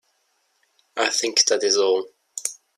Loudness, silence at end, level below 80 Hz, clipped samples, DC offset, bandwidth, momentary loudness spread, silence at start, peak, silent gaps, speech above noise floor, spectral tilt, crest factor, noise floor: -20 LUFS; 0.25 s; -78 dBFS; under 0.1%; under 0.1%; 15 kHz; 14 LU; 0.95 s; -2 dBFS; none; 48 dB; 0.5 dB/octave; 22 dB; -68 dBFS